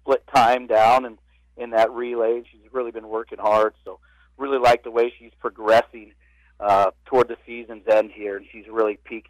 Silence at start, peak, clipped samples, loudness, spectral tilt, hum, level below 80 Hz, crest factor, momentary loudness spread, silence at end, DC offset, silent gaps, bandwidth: 0.05 s; -10 dBFS; under 0.1%; -21 LUFS; -4.5 dB/octave; none; -56 dBFS; 12 dB; 15 LU; 0.1 s; under 0.1%; none; 16 kHz